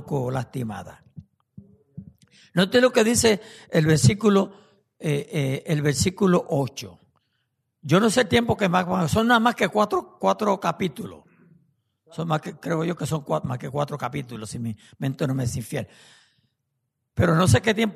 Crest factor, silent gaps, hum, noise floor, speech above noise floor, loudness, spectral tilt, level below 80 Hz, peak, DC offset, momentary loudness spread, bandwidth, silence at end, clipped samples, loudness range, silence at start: 18 dB; none; none; -78 dBFS; 55 dB; -23 LUFS; -5 dB/octave; -52 dBFS; -6 dBFS; under 0.1%; 15 LU; 13.5 kHz; 0 s; under 0.1%; 8 LU; 0 s